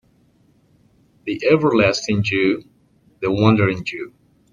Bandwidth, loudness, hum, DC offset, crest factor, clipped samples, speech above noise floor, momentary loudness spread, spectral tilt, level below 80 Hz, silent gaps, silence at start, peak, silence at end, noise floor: 7.4 kHz; -18 LUFS; none; under 0.1%; 18 dB; under 0.1%; 40 dB; 14 LU; -6 dB/octave; -52 dBFS; none; 1.25 s; -2 dBFS; 0.45 s; -57 dBFS